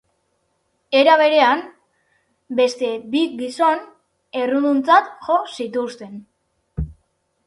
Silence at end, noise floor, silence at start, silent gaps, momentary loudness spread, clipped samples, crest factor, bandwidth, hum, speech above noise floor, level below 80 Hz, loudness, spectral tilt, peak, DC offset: 0.55 s; -68 dBFS; 0.9 s; none; 17 LU; under 0.1%; 20 dB; 11.5 kHz; none; 51 dB; -44 dBFS; -18 LUFS; -5 dB/octave; 0 dBFS; under 0.1%